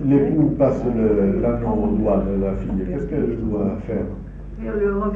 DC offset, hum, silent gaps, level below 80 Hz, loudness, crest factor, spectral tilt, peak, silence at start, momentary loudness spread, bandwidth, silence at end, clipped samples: under 0.1%; none; none; -32 dBFS; -21 LUFS; 14 dB; -11 dB/octave; -6 dBFS; 0 s; 9 LU; 7 kHz; 0 s; under 0.1%